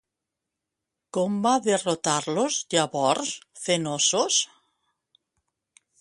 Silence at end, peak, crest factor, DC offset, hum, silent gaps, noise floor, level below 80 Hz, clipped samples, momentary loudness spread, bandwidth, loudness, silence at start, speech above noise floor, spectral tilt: 1.55 s; -6 dBFS; 20 dB; under 0.1%; none; none; -85 dBFS; -72 dBFS; under 0.1%; 8 LU; 11.5 kHz; -24 LUFS; 1.15 s; 61 dB; -2.5 dB/octave